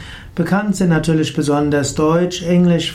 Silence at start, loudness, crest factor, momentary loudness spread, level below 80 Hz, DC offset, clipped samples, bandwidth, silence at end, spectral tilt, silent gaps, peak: 0 s; -16 LUFS; 12 dB; 4 LU; -40 dBFS; under 0.1%; under 0.1%; 13 kHz; 0 s; -6 dB/octave; none; -4 dBFS